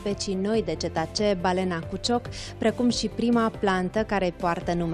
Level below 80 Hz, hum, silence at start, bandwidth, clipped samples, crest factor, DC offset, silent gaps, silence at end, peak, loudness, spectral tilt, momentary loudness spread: -46 dBFS; none; 0 s; 12 kHz; under 0.1%; 16 dB; under 0.1%; none; 0 s; -10 dBFS; -26 LUFS; -5 dB/octave; 5 LU